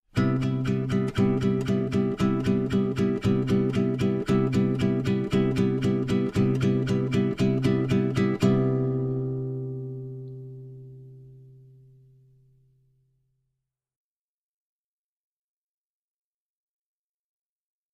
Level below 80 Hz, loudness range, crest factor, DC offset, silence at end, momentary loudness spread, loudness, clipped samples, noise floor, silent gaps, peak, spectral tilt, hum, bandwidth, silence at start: -50 dBFS; 11 LU; 18 dB; under 0.1%; 6.55 s; 12 LU; -25 LUFS; under 0.1%; under -90 dBFS; none; -8 dBFS; -8 dB/octave; none; 10.5 kHz; 0.15 s